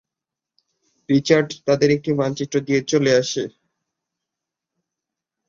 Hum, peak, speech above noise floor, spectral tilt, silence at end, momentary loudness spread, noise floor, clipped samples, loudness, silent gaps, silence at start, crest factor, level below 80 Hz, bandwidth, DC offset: none; -2 dBFS; 68 dB; -5 dB/octave; 2 s; 8 LU; -86 dBFS; under 0.1%; -19 LUFS; none; 1.1 s; 20 dB; -62 dBFS; 7.6 kHz; under 0.1%